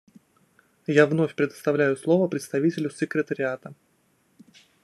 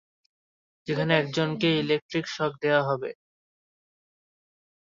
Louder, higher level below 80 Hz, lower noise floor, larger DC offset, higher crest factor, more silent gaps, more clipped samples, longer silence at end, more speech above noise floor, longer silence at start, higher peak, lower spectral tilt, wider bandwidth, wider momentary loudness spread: about the same, -24 LUFS vs -26 LUFS; second, -74 dBFS vs -68 dBFS; second, -66 dBFS vs under -90 dBFS; neither; about the same, 22 dB vs 22 dB; second, none vs 2.02-2.09 s; neither; second, 1.1 s vs 1.85 s; second, 43 dB vs over 64 dB; about the same, 0.9 s vs 0.85 s; first, -4 dBFS vs -8 dBFS; about the same, -6.5 dB/octave vs -6 dB/octave; first, 12.5 kHz vs 7.6 kHz; about the same, 9 LU vs 8 LU